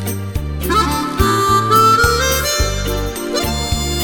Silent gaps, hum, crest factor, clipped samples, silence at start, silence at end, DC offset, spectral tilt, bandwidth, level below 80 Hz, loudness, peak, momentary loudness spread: none; none; 16 dB; under 0.1%; 0 s; 0 s; under 0.1%; -4 dB/octave; over 20 kHz; -24 dBFS; -15 LUFS; 0 dBFS; 11 LU